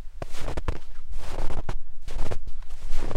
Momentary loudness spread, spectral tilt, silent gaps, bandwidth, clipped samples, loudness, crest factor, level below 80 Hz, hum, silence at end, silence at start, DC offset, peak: 9 LU; -5.5 dB/octave; none; 5.8 kHz; under 0.1%; -37 LUFS; 12 dB; -28 dBFS; none; 0 s; 0 s; under 0.1%; -8 dBFS